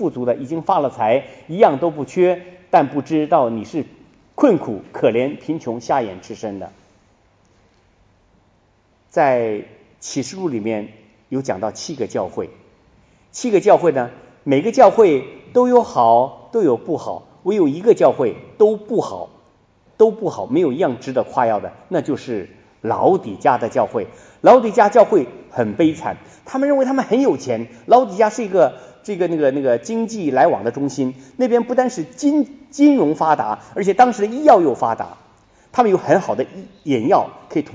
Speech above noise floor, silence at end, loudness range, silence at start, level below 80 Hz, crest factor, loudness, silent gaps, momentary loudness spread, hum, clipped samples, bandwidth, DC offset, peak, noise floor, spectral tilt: 41 dB; 0.1 s; 9 LU; 0 s; -62 dBFS; 18 dB; -17 LUFS; none; 14 LU; none; under 0.1%; 9.6 kHz; under 0.1%; 0 dBFS; -58 dBFS; -6 dB/octave